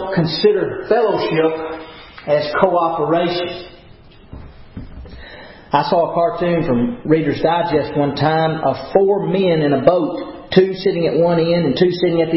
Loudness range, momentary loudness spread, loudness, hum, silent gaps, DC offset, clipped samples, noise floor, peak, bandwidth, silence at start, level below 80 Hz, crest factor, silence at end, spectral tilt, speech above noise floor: 6 LU; 17 LU; -16 LUFS; none; none; under 0.1%; under 0.1%; -42 dBFS; 0 dBFS; 5.8 kHz; 0 s; -44 dBFS; 16 dB; 0 s; -10.5 dB/octave; 27 dB